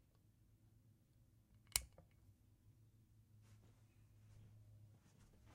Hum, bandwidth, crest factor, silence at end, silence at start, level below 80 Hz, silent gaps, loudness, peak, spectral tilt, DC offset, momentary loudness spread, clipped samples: none; 15.5 kHz; 42 dB; 0 s; 0 s; -70 dBFS; none; -44 LUFS; -16 dBFS; -0.5 dB/octave; under 0.1%; 26 LU; under 0.1%